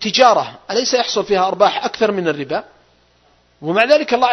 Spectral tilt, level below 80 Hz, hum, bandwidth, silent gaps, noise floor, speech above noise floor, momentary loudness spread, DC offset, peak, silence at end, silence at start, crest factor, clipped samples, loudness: -3 dB/octave; -58 dBFS; none; 8.2 kHz; none; -55 dBFS; 40 dB; 10 LU; under 0.1%; 0 dBFS; 0 s; 0 s; 16 dB; under 0.1%; -16 LUFS